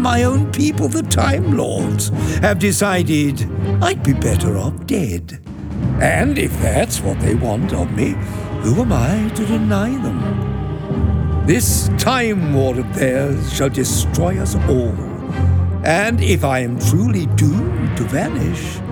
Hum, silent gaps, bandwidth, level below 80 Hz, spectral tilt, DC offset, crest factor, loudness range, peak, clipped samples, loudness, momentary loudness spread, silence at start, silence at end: none; none; 20 kHz; -28 dBFS; -5.5 dB/octave; under 0.1%; 14 dB; 2 LU; -2 dBFS; under 0.1%; -17 LUFS; 6 LU; 0 s; 0 s